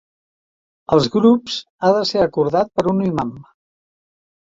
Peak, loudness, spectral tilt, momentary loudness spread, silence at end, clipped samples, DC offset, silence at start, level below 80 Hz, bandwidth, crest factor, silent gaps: -2 dBFS; -18 LUFS; -6.5 dB/octave; 8 LU; 1 s; under 0.1%; under 0.1%; 0.9 s; -52 dBFS; 7.8 kHz; 18 dB; 1.70-1.79 s